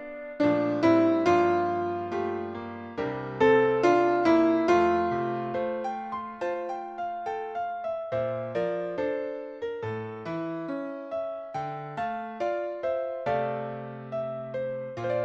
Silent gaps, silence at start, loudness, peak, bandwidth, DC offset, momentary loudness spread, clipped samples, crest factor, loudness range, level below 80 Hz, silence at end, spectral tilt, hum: none; 0 s; -28 LUFS; -10 dBFS; 7.6 kHz; under 0.1%; 13 LU; under 0.1%; 18 dB; 9 LU; -64 dBFS; 0 s; -7 dB/octave; none